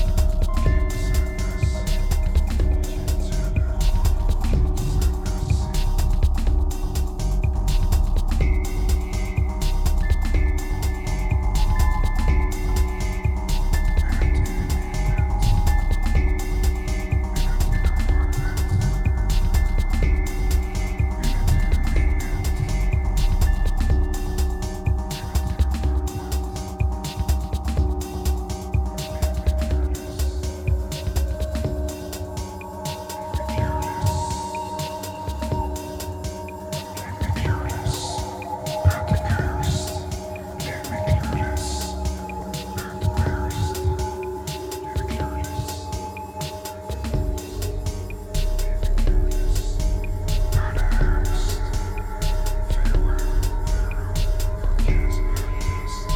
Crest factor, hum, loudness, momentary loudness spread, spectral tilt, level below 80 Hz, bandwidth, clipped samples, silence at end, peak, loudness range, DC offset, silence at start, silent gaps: 14 dB; none; -25 LUFS; 7 LU; -5.5 dB/octave; -22 dBFS; 16.5 kHz; under 0.1%; 0 s; -6 dBFS; 4 LU; under 0.1%; 0 s; none